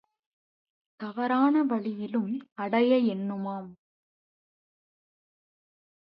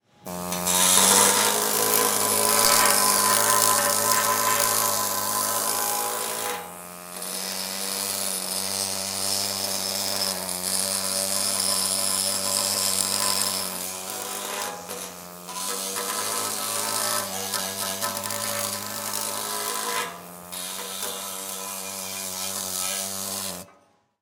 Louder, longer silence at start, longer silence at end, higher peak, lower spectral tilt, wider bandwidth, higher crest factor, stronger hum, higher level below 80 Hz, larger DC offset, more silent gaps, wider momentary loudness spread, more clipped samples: second, -27 LUFS vs -23 LUFS; first, 1 s vs 0.25 s; first, 2.35 s vs 0.55 s; second, -12 dBFS vs 0 dBFS; first, -10 dB/octave vs -0.5 dB/octave; second, 5.4 kHz vs 19 kHz; second, 18 dB vs 26 dB; neither; second, -82 dBFS vs -68 dBFS; neither; first, 2.52-2.56 s vs none; about the same, 15 LU vs 13 LU; neither